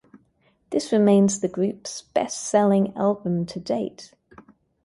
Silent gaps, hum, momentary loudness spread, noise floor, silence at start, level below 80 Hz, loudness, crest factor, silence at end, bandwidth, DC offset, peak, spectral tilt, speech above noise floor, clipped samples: none; none; 10 LU; -64 dBFS; 0.7 s; -64 dBFS; -23 LUFS; 18 dB; 0.8 s; 11.5 kHz; under 0.1%; -6 dBFS; -6 dB/octave; 42 dB; under 0.1%